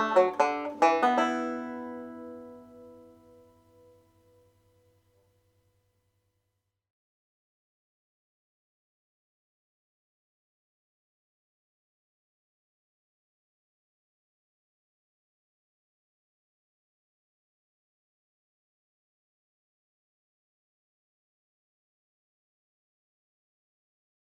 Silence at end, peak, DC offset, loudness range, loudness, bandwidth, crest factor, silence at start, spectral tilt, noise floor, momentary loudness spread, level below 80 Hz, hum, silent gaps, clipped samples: 21.3 s; -8 dBFS; under 0.1%; 23 LU; -27 LUFS; 12.5 kHz; 30 dB; 0 s; -4 dB/octave; -82 dBFS; 24 LU; -84 dBFS; none; none; under 0.1%